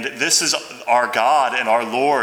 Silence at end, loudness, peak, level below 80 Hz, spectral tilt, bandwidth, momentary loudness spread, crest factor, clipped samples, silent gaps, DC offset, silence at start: 0 s; -17 LUFS; -2 dBFS; -72 dBFS; -1 dB/octave; 19.5 kHz; 4 LU; 16 dB; under 0.1%; none; under 0.1%; 0 s